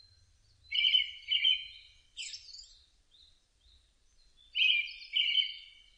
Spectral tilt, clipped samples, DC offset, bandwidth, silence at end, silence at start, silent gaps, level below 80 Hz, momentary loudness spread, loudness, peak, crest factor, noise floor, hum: 4 dB/octave; under 0.1%; under 0.1%; 9.8 kHz; 0.3 s; 0.7 s; none; -70 dBFS; 21 LU; -28 LUFS; -16 dBFS; 20 dB; -66 dBFS; none